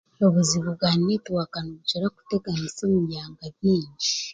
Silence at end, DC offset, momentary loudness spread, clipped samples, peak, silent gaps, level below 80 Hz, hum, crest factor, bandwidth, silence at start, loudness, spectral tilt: 0 s; under 0.1%; 9 LU; under 0.1%; -8 dBFS; none; -56 dBFS; none; 16 dB; 9.4 kHz; 0.2 s; -24 LUFS; -5 dB/octave